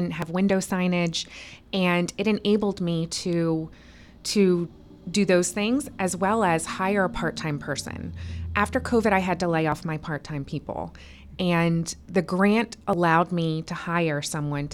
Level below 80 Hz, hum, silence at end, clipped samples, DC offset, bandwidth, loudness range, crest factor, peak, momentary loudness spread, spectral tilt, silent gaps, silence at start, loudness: -48 dBFS; none; 0 s; under 0.1%; under 0.1%; 14 kHz; 2 LU; 18 dB; -6 dBFS; 11 LU; -5.5 dB/octave; none; 0 s; -25 LUFS